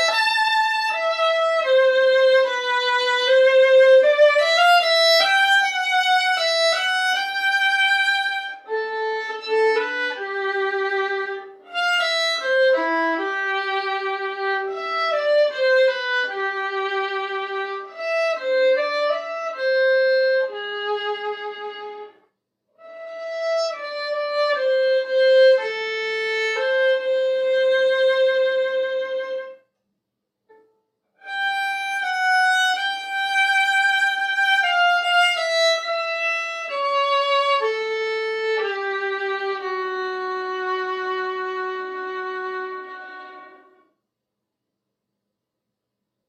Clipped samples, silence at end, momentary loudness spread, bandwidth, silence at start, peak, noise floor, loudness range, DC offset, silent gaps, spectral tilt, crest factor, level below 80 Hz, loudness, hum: under 0.1%; 2.8 s; 12 LU; 12.5 kHz; 0 s; -6 dBFS; -82 dBFS; 12 LU; under 0.1%; none; 0.5 dB/octave; 16 dB; -88 dBFS; -20 LUFS; none